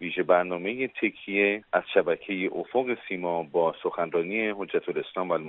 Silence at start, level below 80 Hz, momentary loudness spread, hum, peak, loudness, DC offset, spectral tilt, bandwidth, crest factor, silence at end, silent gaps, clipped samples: 0 s; -74 dBFS; 6 LU; none; -6 dBFS; -27 LUFS; under 0.1%; -3 dB/octave; 4.1 kHz; 22 dB; 0 s; none; under 0.1%